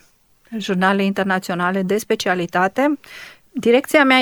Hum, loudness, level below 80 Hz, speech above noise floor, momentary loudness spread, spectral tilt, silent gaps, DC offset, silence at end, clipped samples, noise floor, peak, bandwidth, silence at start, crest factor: none; -18 LUFS; -62 dBFS; 38 dB; 15 LU; -5 dB/octave; none; under 0.1%; 0 s; under 0.1%; -55 dBFS; -2 dBFS; 20 kHz; 0.5 s; 18 dB